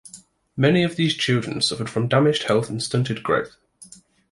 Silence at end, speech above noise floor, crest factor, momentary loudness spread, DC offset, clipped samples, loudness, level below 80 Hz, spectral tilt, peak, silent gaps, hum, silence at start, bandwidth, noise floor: 0.45 s; 27 dB; 18 dB; 6 LU; under 0.1%; under 0.1%; -21 LUFS; -56 dBFS; -5 dB/octave; -4 dBFS; none; none; 0.05 s; 11.5 kHz; -48 dBFS